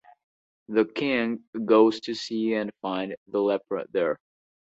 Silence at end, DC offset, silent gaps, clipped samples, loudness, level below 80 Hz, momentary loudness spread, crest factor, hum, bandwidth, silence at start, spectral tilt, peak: 0.55 s; under 0.1%; 1.47-1.53 s, 3.17-3.26 s; under 0.1%; -26 LUFS; -70 dBFS; 11 LU; 20 dB; none; 8 kHz; 0.7 s; -5.5 dB/octave; -6 dBFS